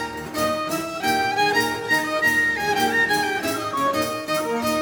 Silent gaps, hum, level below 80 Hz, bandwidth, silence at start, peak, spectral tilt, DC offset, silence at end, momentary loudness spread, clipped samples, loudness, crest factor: none; none; -54 dBFS; over 20 kHz; 0 s; -8 dBFS; -3 dB/octave; under 0.1%; 0 s; 6 LU; under 0.1%; -21 LUFS; 14 dB